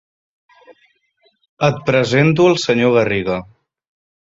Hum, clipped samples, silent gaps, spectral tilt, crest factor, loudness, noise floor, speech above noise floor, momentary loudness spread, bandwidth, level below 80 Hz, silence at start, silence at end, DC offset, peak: none; under 0.1%; none; -6 dB/octave; 16 dB; -15 LUFS; -61 dBFS; 46 dB; 7 LU; 7.8 kHz; -52 dBFS; 1.6 s; 0.8 s; under 0.1%; -2 dBFS